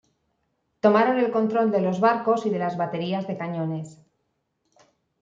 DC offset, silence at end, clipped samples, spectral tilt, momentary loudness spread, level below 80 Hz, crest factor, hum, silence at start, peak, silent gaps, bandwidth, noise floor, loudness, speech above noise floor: under 0.1%; 1.3 s; under 0.1%; -7.5 dB/octave; 10 LU; -72 dBFS; 20 dB; none; 0.85 s; -4 dBFS; none; 7.8 kHz; -75 dBFS; -23 LUFS; 52 dB